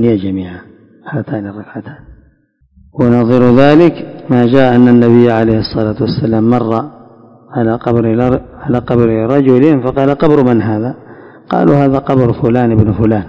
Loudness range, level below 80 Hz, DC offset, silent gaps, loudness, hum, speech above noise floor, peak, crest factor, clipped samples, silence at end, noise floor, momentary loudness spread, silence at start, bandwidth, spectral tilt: 5 LU; -36 dBFS; under 0.1%; none; -11 LUFS; none; 42 dB; 0 dBFS; 10 dB; 2%; 0 s; -52 dBFS; 15 LU; 0 s; 6 kHz; -9.5 dB/octave